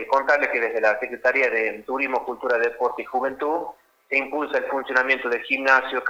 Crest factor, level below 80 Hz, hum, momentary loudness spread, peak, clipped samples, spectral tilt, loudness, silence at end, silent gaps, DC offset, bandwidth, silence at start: 20 dB; -66 dBFS; none; 7 LU; -4 dBFS; under 0.1%; -3 dB/octave; -22 LUFS; 0 s; none; under 0.1%; over 20 kHz; 0 s